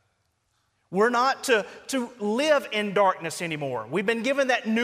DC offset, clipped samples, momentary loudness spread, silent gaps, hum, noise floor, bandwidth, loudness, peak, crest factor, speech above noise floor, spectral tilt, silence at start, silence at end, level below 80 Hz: under 0.1%; under 0.1%; 8 LU; none; none; -72 dBFS; 15.5 kHz; -25 LUFS; -8 dBFS; 16 dB; 47 dB; -4 dB/octave; 0.9 s; 0 s; -72 dBFS